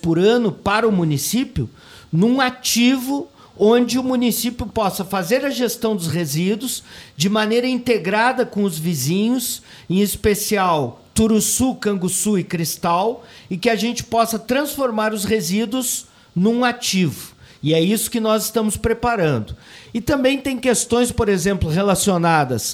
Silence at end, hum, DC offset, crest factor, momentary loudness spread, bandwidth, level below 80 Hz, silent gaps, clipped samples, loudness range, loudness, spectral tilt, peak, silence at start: 0 s; none; under 0.1%; 16 dB; 9 LU; 16.5 kHz; -42 dBFS; none; under 0.1%; 2 LU; -19 LUFS; -4.5 dB/octave; -2 dBFS; 0.05 s